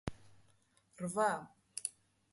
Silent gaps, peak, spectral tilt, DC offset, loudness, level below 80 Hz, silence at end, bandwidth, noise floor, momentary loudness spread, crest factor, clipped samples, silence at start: none; -20 dBFS; -4 dB/octave; under 0.1%; -39 LUFS; -64 dBFS; 0.4 s; 12 kHz; -72 dBFS; 13 LU; 22 dB; under 0.1%; 0.05 s